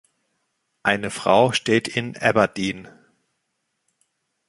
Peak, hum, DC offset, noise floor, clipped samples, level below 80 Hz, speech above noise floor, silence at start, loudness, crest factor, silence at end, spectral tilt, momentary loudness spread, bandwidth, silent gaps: -2 dBFS; none; under 0.1%; -75 dBFS; under 0.1%; -58 dBFS; 55 dB; 0.85 s; -21 LUFS; 22 dB; 1.6 s; -4.5 dB/octave; 10 LU; 11.5 kHz; none